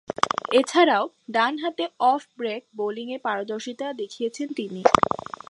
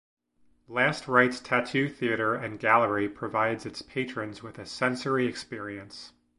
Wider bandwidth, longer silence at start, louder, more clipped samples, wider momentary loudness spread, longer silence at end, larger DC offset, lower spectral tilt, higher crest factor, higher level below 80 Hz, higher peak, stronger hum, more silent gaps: about the same, 11.5 kHz vs 11.5 kHz; second, 0.1 s vs 0.7 s; first, -24 LUFS vs -27 LUFS; neither; second, 12 LU vs 15 LU; about the same, 0.35 s vs 0.3 s; neither; second, -4 dB/octave vs -5.5 dB/octave; about the same, 24 dB vs 24 dB; first, -58 dBFS vs -64 dBFS; first, 0 dBFS vs -4 dBFS; neither; neither